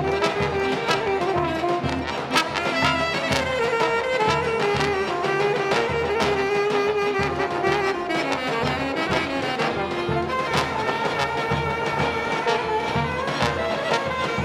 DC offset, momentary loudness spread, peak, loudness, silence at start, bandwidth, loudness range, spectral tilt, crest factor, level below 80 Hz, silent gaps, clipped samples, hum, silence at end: under 0.1%; 3 LU; -2 dBFS; -23 LUFS; 0 s; 14.5 kHz; 2 LU; -4.5 dB/octave; 22 dB; -44 dBFS; none; under 0.1%; none; 0 s